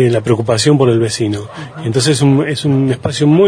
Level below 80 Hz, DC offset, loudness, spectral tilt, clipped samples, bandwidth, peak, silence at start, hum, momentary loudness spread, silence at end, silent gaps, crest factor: -48 dBFS; under 0.1%; -13 LUFS; -6 dB/octave; under 0.1%; 10.5 kHz; 0 dBFS; 0 s; none; 8 LU; 0 s; none; 12 dB